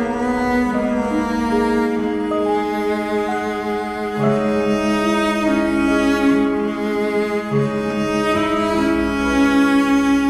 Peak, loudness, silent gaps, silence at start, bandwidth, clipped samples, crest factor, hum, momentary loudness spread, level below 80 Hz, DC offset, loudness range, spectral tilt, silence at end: -6 dBFS; -18 LUFS; none; 0 s; 14 kHz; under 0.1%; 12 dB; none; 5 LU; -40 dBFS; under 0.1%; 2 LU; -6 dB/octave; 0 s